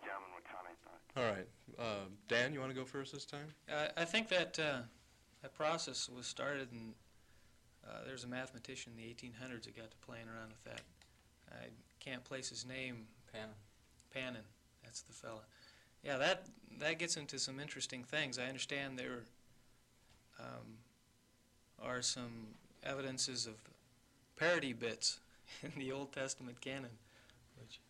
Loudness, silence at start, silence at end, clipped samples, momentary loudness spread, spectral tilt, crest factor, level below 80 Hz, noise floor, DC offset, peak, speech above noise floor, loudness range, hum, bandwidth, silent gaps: -42 LUFS; 0 s; 0.1 s; under 0.1%; 19 LU; -2.5 dB/octave; 24 dB; -76 dBFS; -72 dBFS; under 0.1%; -22 dBFS; 29 dB; 11 LU; none; 16 kHz; none